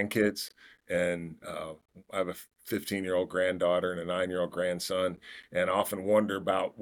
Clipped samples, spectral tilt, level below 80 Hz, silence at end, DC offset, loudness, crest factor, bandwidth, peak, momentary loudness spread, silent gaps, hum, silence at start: under 0.1%; -4.5 dB/octave; -68 dBFS; 0 s; under 0.1%; -31 LUFS; 18 dB; 19 kHz; -12 dBFS; 13 LU; none; none; 0 s